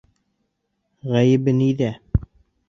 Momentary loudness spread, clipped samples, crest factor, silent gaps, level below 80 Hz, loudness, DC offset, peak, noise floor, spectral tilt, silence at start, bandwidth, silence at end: 9 LU; under 0.1%; 18 dB; none; -38 dBFS; -20 LUFS; under 0.1%; -4 dBFS; -73 dBFS; -8 dB/octave; 1.05 s; 7.2 kHz; 0.45 s